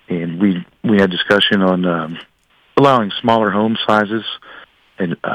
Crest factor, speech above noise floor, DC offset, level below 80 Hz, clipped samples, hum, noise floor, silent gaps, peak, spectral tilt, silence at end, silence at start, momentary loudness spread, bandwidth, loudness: 14 dB; 26 dB; under 0.1%; -56 dBFS; under 0.1%; none; -41 dBFS; none; -2 dBFS; -6.5 dB/octave; 0 s; 0.1 s; 11 LU; 10 kHz; -15 LUFS